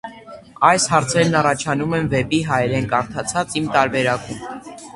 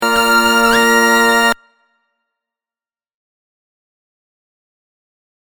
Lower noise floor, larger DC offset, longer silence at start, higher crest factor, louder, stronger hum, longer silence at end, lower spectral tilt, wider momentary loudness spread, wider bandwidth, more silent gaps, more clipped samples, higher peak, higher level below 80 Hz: second, -40 dBFS vs under -90 dBFS; neither; about the same, 0.05 s vs 0 s; about the same, 20 dB vs 16 dB; second, -18 LUFS vs -11 LUFS; neither; second, 0.05 s vs 4 s; first, -4.5 dB/octave vs -1.5 dB/octave; first, 13 LU vs 4 LU; second, 11.5 kHz vs over 20 kHz; neither; neither; about the same, 0 dBFS vs 0 dBFS; about the same, -48 dBFS vs -46 dBFS